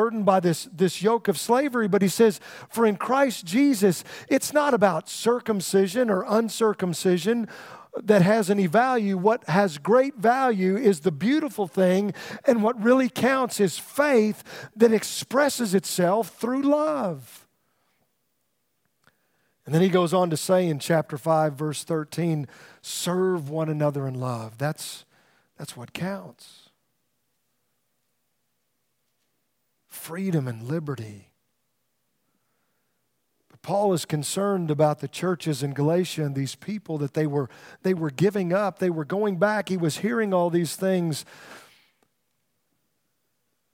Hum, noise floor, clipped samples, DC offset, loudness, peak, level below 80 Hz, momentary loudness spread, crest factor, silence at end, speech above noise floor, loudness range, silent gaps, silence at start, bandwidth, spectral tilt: none; -76 dBFS; under 0.1%; under 0.1%; -24 LUFS; -4 dBFS; -74 dBFS; 11 LU; 20 dB; 2.15 s; 52 dB; 11 LU; none; 0 s; 16.5 kHz; -5.5 dB/octave